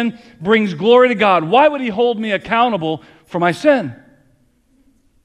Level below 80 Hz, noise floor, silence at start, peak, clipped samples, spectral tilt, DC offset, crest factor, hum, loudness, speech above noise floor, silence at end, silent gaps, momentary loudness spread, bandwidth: -56 dBFS; -57 dBFS; 0 s; 0 dBFS; under 0.1%; -6 dB/octave; under 0.1%; 16 dB; none; -15 LUFS; 42 dB; 1.3 s; none; 13 LU; 11 kHz